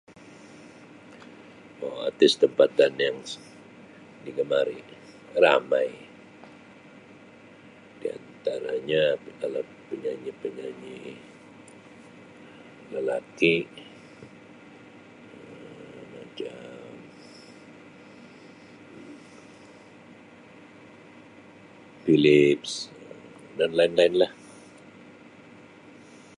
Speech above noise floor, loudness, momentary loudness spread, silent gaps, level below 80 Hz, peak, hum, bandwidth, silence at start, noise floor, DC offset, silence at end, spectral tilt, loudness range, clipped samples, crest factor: 26 dB; -25 LUFS; 28 LU; none; -70 dBFS; -6 dBFS; none; 11 kHz; 1.8 s; -50 dBFS; under 0.1%; 2.05 s; -5 dB/octave; 22 LU; under 0.1%; 24 dB